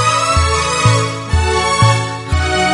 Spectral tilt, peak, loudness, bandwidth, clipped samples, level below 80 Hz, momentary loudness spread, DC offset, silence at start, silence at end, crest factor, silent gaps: -4 dB/octave; 0 dBFS; -14 LUFS; 11.5 kHz; under 0.1%; -26 dBFS; 5 LU; under 0.1%; 0 s; 0 s; 14 dB; none